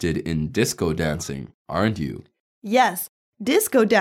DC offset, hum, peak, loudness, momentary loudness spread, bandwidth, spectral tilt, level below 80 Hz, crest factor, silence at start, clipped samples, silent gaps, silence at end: under 0.1%; none; -4 dBFS; -23 LUFS; 15 LU; 17.5 kHz; -4.5 dB/octave; -46 dBFS; 18 dB; 0 s; under 0.1%; 1.54-1.65 s, 2.40-2.62 s, 3.09-3.32 s; 0 s